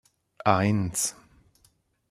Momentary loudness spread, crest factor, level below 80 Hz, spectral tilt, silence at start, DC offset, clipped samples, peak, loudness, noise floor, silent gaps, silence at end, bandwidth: 6 LU; 24 dB; -58 dBFS; -4.5 dB/octave; 0.45 s; under 0.1%; under 0.1%; -4 dBFS; -26 LUFS; -66 dBFS; none; 1 s; 15 kHz